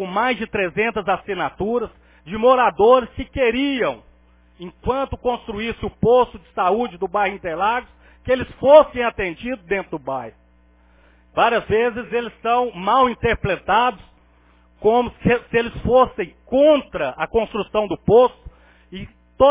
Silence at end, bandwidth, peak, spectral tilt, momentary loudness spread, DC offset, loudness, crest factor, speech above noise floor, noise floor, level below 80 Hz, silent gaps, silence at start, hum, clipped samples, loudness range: 0 s; 3.8 kHz; 0 dBFS; -9.5 dB/octave; 13 LU; under 0.1%; -19 LUFS; 20 dB; 35 dB; -54 dBFS; -42 dBFS; none; 0 s; 60 Hz at -50 dBFS; under 0.1%; 4 LU